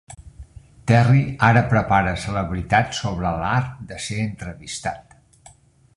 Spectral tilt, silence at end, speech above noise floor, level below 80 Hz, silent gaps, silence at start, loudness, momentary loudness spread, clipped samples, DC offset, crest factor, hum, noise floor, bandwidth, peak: -6 dB/octave; 0.95 s; 31 dB; -40 dBFS; none; 0.1 s; -20 LUFS; 15 LU; under 0.1%; under 0.1%; 20 dB; none; -51 dBFS; 11.5 kHz; -2 dBFS